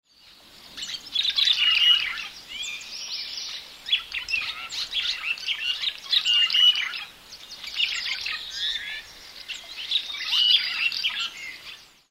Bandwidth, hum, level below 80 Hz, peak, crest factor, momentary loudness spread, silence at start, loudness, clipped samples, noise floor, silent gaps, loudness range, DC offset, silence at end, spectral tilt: 16 kHz; none; -62 dBFS; -6 dBFS; 20 dB; 19 LU; 0.25 s; -23 LUFS; under 0.1%; -53 dBFS; none; 6 LU; under 0.1%; 0.25 s; 2.5 dB/octave